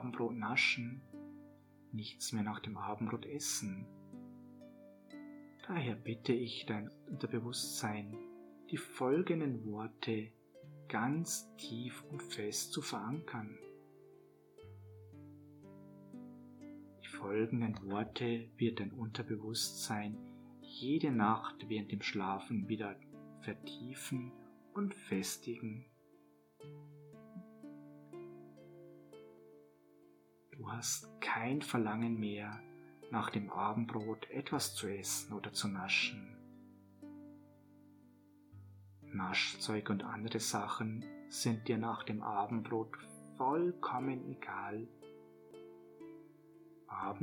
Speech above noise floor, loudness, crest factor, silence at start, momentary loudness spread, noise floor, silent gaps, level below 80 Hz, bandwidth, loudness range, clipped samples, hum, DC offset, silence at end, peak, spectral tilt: 28 dB; -39 LUFS; 22 dB; 0 s; 22 LU; -67 dBFS; none; -82 dBFS; 19 kHz; 11 LU; under 0.1%; none; under 0.1%; 0 s; -18 dBFS; -4 dB/octave